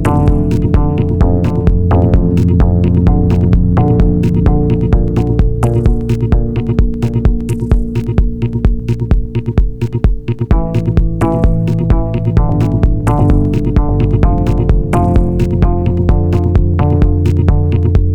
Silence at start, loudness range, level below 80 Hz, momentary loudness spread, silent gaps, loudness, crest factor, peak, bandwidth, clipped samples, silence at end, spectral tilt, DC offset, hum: 0 s; 4 LU; -16 dBFS; 4 LU; none; -13 LUFS; 10 dB; 0 dBFS; 9.4 kHz; under 0.1%; 0 s; -9.5 dB/octave; under 0.1%; none